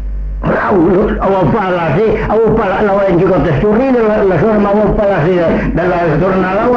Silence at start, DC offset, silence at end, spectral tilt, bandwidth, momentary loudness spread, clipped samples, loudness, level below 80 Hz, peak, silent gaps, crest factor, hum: 0 s; under 0.1%; 0 s; -9 dB/octave; 7.2 kHz; 2 LU; under 0.1%; -11 LUFS; -26 dBFS; -2 dBFS; none; 8 dB; none